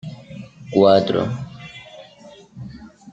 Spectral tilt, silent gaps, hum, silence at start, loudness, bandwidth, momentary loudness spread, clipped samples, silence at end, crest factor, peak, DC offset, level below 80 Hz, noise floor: -7.5 dB/octave; none; none; 0.05 s; -18 LUFS; 8 kHz; 26 LU; under 0.1%; 0 s; 20 dB; -2 dBFS; under 0.1%; -56 dBFS; -45 dBFS